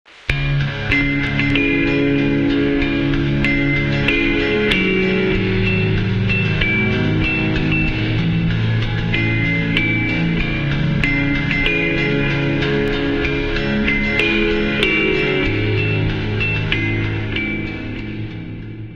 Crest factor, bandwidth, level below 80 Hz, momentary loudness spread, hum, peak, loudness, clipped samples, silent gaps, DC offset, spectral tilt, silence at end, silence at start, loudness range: 18 dB; 7.4 kHz; -28 dBFS; 5 LU; none; 0 dBFS; -17 LUFS; under 0.1%; none; under 0.1%; -7 dB/octave; 0 s; 0.2 s; 1 LU